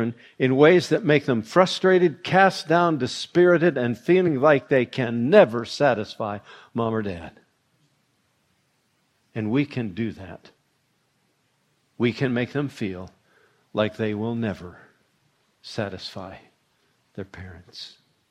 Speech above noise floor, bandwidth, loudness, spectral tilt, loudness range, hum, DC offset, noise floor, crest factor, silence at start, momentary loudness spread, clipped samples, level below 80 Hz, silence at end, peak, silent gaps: 47 dB; 11 kHz; -22 LUFS; -6.5 dB/octave; 14 LU; none; under 0.1%; -69 dBFS; 24 dB; 0 s; 22 LU; under 0.1%; -64 dBFS; 0.45 s; 0 dBFS; none